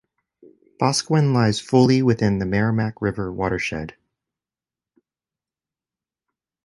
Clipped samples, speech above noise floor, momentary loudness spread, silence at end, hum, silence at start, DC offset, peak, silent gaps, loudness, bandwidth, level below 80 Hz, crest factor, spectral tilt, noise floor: under 0.1%; over 71 dB; 9 LU; 2.75 s; none; 0.8 s; under 0.1%; -2 dBFS; none; -20 LUFS; 11.5 kHz; -48 dBFS; 20 dB; -6 dB/octave; under -90 dBFS